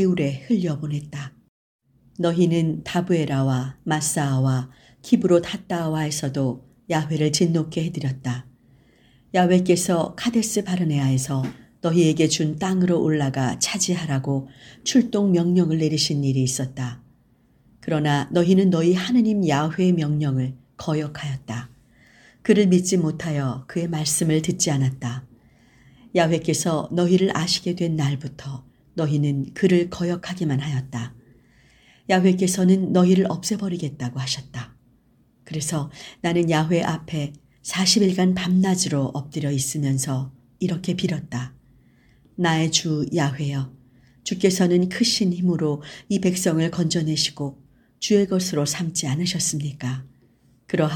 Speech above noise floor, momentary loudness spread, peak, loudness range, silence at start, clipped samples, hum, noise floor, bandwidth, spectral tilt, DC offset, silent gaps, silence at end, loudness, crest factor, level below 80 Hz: 38 dB; 13 LU; -4 dBFS; 4 LU; 0 s; under 0.1%; none; -59 dBFS; 19 kHz; -5 dB/octave; under 0.1%; 1.49-1.79 s; 0 s; -22 LUFS; 18 dB; -56 dBFS